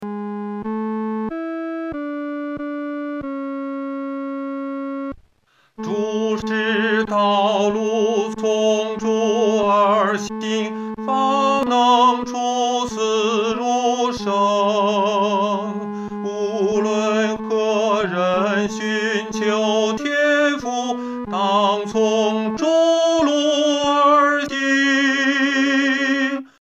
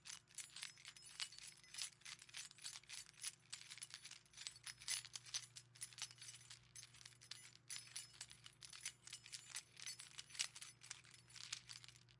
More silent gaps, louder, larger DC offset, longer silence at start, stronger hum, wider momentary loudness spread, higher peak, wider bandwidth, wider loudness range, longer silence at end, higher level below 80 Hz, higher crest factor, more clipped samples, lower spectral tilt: neither; first, -19 LUFS vs -52 LUFS; neither; about the same, 0 s vs 0 s; neither; about the same, 11 LU vs 11 LU; first, -4 dBFS vs -22 dBFS; second, 8.6 kHz vs 12 kHz; first, 10 LU vs 4 LU; first, 0.15 s vs 0 s; first, -56 dBFS vs -86 dBFS; second, 16 dB vs 34 dB; neither; first, -4 dB/octave vs 1 dB/octave